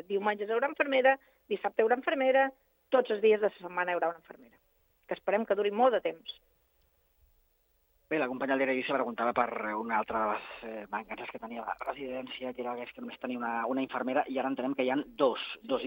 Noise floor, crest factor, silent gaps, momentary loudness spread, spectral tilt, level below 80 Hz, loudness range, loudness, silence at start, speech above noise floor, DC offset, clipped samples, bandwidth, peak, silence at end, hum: -72 dBFS; 22 dB; none; 13 LU; -7 dB/octave; -72 dBFS; 7 LU; -31 LUFS; 0.1 s; 41 dB; under 0.1%; under 0.1%; 16.5 kHz; -10 dBFS; 0 s; none